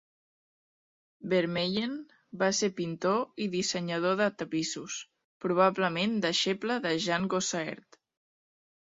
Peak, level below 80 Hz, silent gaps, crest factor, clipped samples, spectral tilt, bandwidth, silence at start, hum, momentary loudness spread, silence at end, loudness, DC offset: -10 dBFS; -72 dBFS; 5.24-5.40 s; 20 dB; under 0.1%; -4 dB/octave; 8 kHz; 1.2 s; none; 12 LU; 1.05 s; -30 LUFS; under 0.1%